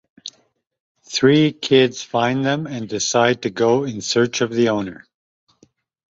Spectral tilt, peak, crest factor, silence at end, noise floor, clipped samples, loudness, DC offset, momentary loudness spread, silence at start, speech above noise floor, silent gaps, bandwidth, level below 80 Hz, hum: -4.5 dB/octave; -2 dBFS; 18 dB; 1.15 s; -62 dBFS; under 0.1%; -18 LUFS; under 0.1%; 11 LU; 0.25 s; 44 dB; 0.80-0.95 s; 8 kHz; -60 dBFS; none